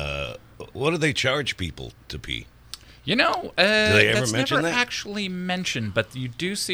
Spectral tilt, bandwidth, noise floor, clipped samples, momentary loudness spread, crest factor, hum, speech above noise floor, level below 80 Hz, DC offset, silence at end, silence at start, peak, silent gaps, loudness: -4 dB/octave; over 20 kHz; -44 dBFS; under 0.1%; 19 LU; 24 dB; none; 21 dB; -48 dBFS; under 0.1%; 0 s; 0 s; 0 dBFS; none; -23 LUFS